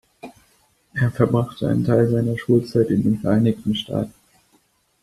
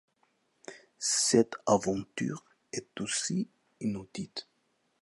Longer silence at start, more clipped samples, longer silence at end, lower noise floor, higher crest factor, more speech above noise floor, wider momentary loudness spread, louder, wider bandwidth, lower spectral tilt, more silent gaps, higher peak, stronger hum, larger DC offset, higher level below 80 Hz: second, 0.25 s vs 0.7 s; neither; first, 0.95 s vs 0.6 s; second, -62 dBFS vs -75 dBFS; about the same, 18 dB vs 22 dB; about the same, 43 dB vs 44 dB; second, 8 LU vs 19 LU; first, -20 LUFS vs -31 LUFS; first, 13 kHz vs 11.5 kHz; first, -8 dB/octave vs -3.5 dB/octave; neither; first, -2 dBFS vs -10 dBFS; neither; neither; first, -52 dBFS vs -68 dBFS